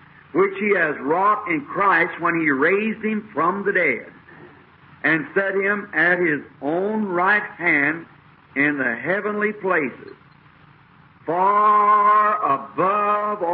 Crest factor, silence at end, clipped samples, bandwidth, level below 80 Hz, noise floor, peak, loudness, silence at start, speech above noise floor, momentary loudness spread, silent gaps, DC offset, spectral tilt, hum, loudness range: 14 dB; 0 s; under 0.1%; 4.9 kHz; -66 dBFS; -51 dBFS; -6 dBFS; -20 LUFS; 0.35 s; 31 dB; 9 LU; none; under 0.1%; -10.5 dB/octave; none; 3 LU